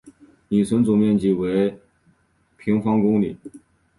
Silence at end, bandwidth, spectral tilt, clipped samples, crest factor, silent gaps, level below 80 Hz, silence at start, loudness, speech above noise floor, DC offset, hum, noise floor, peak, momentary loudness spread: 0.4 s; 11.5 kHz; -8 dB/octave; under 0.1%; 14 dB; none; -54 dBFS; 0.05 s; -20 LUFS; 43 dB; under 0.1%; none; -62 dBFS; -8 dBFS; 9 LU